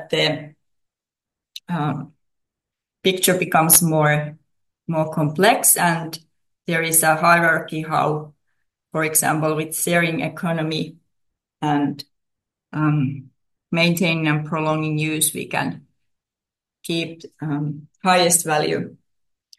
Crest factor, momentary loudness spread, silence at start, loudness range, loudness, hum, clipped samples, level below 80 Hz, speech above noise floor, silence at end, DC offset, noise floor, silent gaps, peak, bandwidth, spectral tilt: 22 dB; 17 LU; 0 s; 7 LU; -19 LUFS; none; under 0.1%; -64 dBFS; 68 dB; 0.7 s; under 0.1%; -88 dBFS; none; 0 dBFS; 12.5 kHz; -3.5 dB/octave